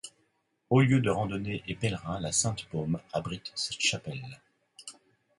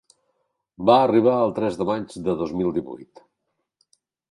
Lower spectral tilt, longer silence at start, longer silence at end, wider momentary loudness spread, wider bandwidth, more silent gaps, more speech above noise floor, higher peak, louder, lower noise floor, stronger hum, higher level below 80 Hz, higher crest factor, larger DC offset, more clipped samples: second, -4.5 dB/octave vs -7.5 dB/octave; second, 0.05 s vs 0.8 s; second, 0.45 s vs 1.25 s; first, 22 LU vs 12 LU; about the same, 11.5 kHz vs 11.5 kHz; neither; second, 45 dB vs 57 dB; second, -10 dBFS vs -2 dBFS; second, -30 LUFS vs -21 LUFS; about the same, -74 dBFS vs -77 dBFS; neither; about the same, -56 dBFS vs -58 dBFS; about the same, 20 dB vs 22 dB; neither; neither